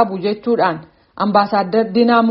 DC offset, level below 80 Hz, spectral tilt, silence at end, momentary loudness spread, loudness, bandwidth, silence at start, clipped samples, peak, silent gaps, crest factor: under 0.1%; -58 dBFS; -4.5 dB/octave; 0 s; 7 LU; -16 LUFS; 5.6 kHz; 0 s; under 0.1%; 0 dBFS; none; 16 dB